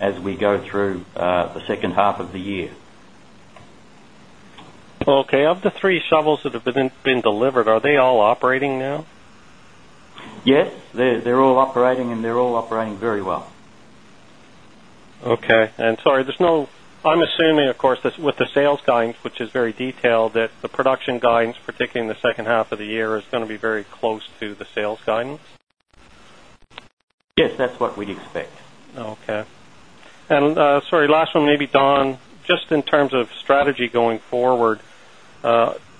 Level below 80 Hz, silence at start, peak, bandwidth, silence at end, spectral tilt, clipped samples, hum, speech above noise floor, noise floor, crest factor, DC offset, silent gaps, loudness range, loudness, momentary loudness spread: -56 dBFS; 0 s; 0 dBFS; 10.5 kHz; 0.2 s; -6 dB/octave; under 0.1%; none; 29 dB; -48 dBFS; 20 dB; 0.4%; 26.93-26.97 s, 27.03-27.18 s; 8 LU; -19 LUFS; 12 LU